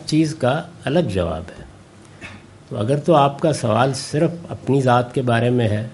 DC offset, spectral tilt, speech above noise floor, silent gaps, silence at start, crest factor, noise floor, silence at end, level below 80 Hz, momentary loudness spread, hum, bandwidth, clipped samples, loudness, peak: under 0.1%; -6.5 dB/octave; 25 dB; none; 0 s; 18 dB; -44 dBFS; 0 s; -48 dBFS; 16 LU; none; 11.5 kHz; under 0.1%; -19 LUFS; 0 dBFS